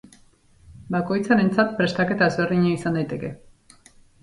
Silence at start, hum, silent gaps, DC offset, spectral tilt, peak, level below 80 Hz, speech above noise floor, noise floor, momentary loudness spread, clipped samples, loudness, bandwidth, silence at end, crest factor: 0.7 s; none; none; under 0.1%; -7 dB/octave; -6 dBFS; -56 dBFS; 34 dB; -55 dBFS; 9 LU; under 0.1%; -22 LUFS; 11.5 kHz; 0.85 s; 18 dB